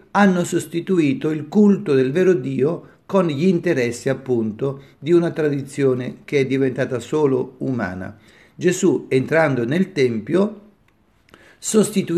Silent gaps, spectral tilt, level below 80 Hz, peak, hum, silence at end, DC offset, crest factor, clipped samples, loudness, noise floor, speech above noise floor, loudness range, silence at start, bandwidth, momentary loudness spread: none; -6 dB/octave; -62 dBFS; -4 dBFS; none; 0 s; under 0.1%; 16 dB; under 0.1%; -19 LUFS; -59 dBFS; 40 dB; 3 LU; 0.15 s; 13.5 kHz; 8 LU